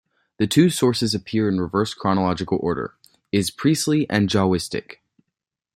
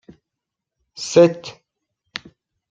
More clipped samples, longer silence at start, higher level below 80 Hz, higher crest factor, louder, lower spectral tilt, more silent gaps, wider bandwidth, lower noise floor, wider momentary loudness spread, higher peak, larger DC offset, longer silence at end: neither; second, 0.4 s vs 1 s; first, -54 dBFS vs -66 dBFS; about the same, 18 dB vs 20 dB; second, -21 LUFS vs -16 LUFS; about the same, -5.5 dB/octave vs -5 dB/octave; neither; first, 16 kHz vs 9 kHz; about the same, -83 dBFS vs -83 dBFS; second, 8 LU vs 20 LU; about the same, -4 dBFS vs -2 dBFS; neither; second, 0.8 s vs 1.2 s